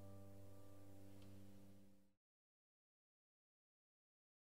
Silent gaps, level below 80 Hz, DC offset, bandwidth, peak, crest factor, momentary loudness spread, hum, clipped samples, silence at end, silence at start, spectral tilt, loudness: none; -82 dBFS; 0.1%; 16 kHz; -48 dBFS; 14 dB; 4 LU; none; under 0.1%; 2.3 s; 0 s; -6.5 dB/octave; -64 LUFS